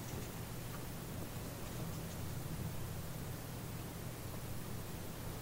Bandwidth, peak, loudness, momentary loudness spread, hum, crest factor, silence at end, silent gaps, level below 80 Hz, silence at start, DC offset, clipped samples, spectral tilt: 16 kHz; -30 dBFS; -45 LUFS; 2 LU; none; 14 dB; 0 s; none; -56 dBFS; 0 s; under 0.1%; under 0.1%; -5 dB/octave